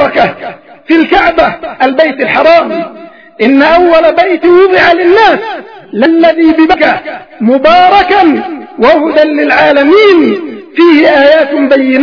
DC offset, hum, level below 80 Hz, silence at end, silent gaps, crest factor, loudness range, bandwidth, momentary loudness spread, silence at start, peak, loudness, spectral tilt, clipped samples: 0.4%; none; -40 dBFS; 0 s; none; 6 dB; 2 LU; 5.4 kHz; 11 LU; 0 s; 0 dBFS; -6 LUFS; -6 dB/octave; 4%